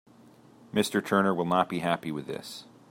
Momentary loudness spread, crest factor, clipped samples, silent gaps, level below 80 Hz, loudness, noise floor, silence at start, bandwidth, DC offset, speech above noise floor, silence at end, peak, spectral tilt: 13 LU; 22 dB; under 0.1%; none; -70 dBFS; -28 LUFS; -55 dBFS; 0.75 s; 16.5 kHz; under 0.1%; 28 dB; 0.25 s; -8 dBFS; -5.5 dB/octave